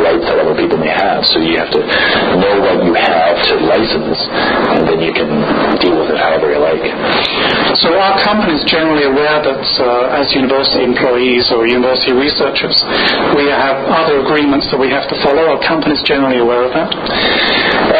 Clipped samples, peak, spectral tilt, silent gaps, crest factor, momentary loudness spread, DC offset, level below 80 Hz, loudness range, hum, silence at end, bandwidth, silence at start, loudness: under 0.1%; 0 dBFS; -7 dB/octave; none; 10 dB; 3 LU; under 0.1%; -40 dBFS; 1 LU; none; 0 s; 8 kHz; 0 s; -11 LUFS